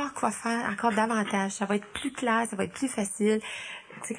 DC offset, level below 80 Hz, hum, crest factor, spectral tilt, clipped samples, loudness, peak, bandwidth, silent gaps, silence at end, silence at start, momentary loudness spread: under 0.1%; -66 dBFS; none; 18 dB; -4 dB/octave; under 0.1%; -29 LUFS; -10 dBFS; 10 kHz; none; 0 s; 0 s; 9 LU